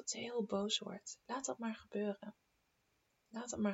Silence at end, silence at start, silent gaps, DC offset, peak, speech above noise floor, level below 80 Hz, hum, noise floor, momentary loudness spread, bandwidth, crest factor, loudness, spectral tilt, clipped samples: 0 s; 0 s; none; under 0.1%; -24 dBFS; 39 dB; -78 dBFS; none; -80 dBFS; 12 LU; 8.2 kHz; 18 dB; -42 LUFS; -3.5 dB/octave; under 0.1%